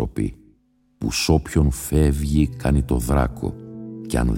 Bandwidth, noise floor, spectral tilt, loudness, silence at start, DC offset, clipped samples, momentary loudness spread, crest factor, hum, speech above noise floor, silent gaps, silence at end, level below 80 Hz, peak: 17 kHz; -61 dBFS; -6 dB/octave; -22 LUFS; 0 s; under 0.1%; under 0.1%; 11 LU; 18 dB; none; 41 dB; none; 0 s; -26 dBFS; -2 dBFS